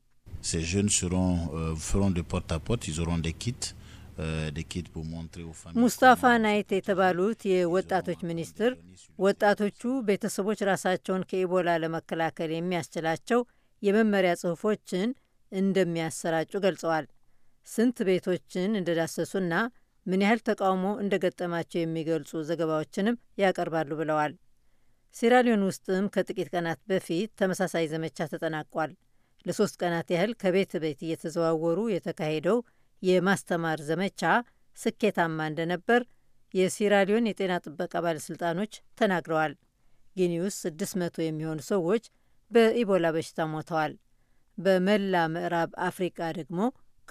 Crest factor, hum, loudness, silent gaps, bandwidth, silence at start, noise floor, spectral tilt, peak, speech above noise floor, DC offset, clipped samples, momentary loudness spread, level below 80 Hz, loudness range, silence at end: 20 dB; none; -28 LUFS; none; 15.5 kHz; 0.25 s; -63 dBFS; -5 dB/octave; -8 dBFS; 36 dB; under 0.1%; under 0.1%; 9 LU; -50 dBFS; 4 LU; 0.4 s